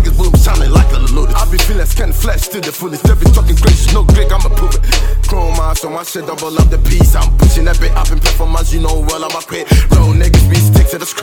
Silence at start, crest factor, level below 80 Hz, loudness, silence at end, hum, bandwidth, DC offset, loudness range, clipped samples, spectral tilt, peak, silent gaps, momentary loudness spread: 0 s; 8 dB; -10 dBFS; -12 LUFS; 0 s; none; 18 kHz; under 0.1%; 2 LU; under 0.1%; -5 dB/octave; 0 dBFS; none; 8 LU